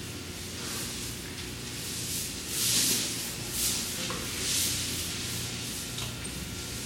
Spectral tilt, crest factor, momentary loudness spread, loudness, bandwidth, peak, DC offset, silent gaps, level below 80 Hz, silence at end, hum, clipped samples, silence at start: -1.5 dB/octave; 20 dB; 11 LU; -30 LUFS; 17 kHz; -12 dBFS; under 0.1%; none; -50 dBFS; 0 s; none; under 0.1%; 0 s